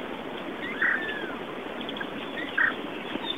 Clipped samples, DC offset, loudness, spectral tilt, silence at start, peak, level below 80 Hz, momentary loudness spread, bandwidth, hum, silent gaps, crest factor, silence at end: under 0.1%; 0.2%; -30 LUFS; -4.5 dB/octave; 0 s; -10 dBFS; -62 dBFS; 10 LU; 16 kHz; none; none; 20 dB; 0 s